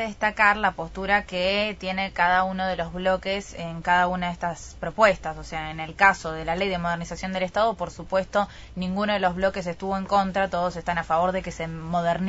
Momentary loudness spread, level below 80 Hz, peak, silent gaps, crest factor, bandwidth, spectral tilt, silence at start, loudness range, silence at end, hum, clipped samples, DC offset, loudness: 12 LU; -46 dBFS; -2 dBFS; none; 22 dB; 8 kHz; -5 dB/octave; 0 s; 2 LU; 0 s; none; under 0.1%; under 0.1%; -25 LUFS